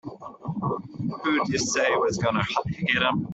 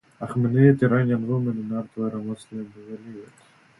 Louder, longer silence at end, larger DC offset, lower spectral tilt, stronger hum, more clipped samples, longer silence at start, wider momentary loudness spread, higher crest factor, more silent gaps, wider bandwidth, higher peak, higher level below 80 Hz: about the same, -25 LUFS vs -23 LUFS; second, 0 s vs 0.55 s; neither; second, -4 dB/octave vs -9.5 dB/octave; neither; neither; second, 0.05 s vs 0.2 s; second, 11 LU vs 22 LU; about the same, 18 dB vs 20 dB; neither; second, 8.4 kHz vs 11.5 kHz; second, -8 dBFS vs -4 dBFS; first, -54 dBFS vs -62 dBFS